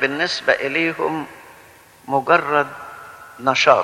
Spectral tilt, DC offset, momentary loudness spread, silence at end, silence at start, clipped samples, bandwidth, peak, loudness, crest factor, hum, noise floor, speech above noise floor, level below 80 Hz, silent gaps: -3.5 dB/octave; under 0.1%; 20 LU; 0 s; 0 s; under 0.1%; 16.5 kHz; 0 dBFS; -19 LUFS; 20 dB; none; -47 dBFS; 29 dB; -64 dBFS; none